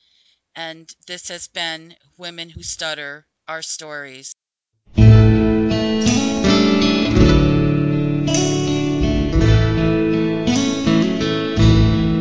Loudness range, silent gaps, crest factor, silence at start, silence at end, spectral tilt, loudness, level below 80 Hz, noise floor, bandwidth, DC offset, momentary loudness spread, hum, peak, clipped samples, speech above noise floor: 14 LU; none; 16 dB; 0.55 s; 0 s; -6 dB/octave; -16 LUFS; -26 dBFS; -76 dBFS; 8 kHz; under 0.1%; 18 LU; none; 0 dBFS; under 0.1%; 46 dB